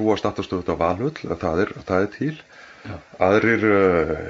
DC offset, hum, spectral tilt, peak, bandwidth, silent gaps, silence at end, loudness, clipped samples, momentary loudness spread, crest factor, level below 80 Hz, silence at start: under 0.1%; none; -7 dB/octave; -4 dBFS; 7.6 kHz; none; 0 s; -21 LUFS; under 0.1%; 20 LU; 18 dB; -46 dBFS; 0 s